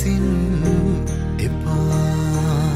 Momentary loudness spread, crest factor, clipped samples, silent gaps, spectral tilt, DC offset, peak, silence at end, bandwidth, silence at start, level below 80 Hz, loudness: 4 LU; 12 dB; under 0.1%; none; -7 dB/octave; under 0.1%; -6 dBFS; 0 s; 14.5 kHz; 0 s; -28 dBFS; -20 LUFS